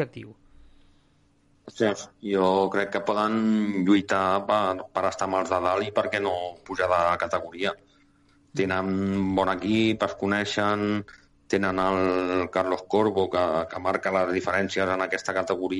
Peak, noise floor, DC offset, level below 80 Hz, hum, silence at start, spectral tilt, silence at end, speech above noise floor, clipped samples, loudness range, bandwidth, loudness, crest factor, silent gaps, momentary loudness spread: -8 dBFS; -63 dBFS; under 0.1%; -58 dBFS; none; 0 s; -5.5 dB/octave; 0 s; 38 dB; under 0.1%; 3 LU; 11.5 kHz; -25 LUFS; 16 dB; none; 6 LU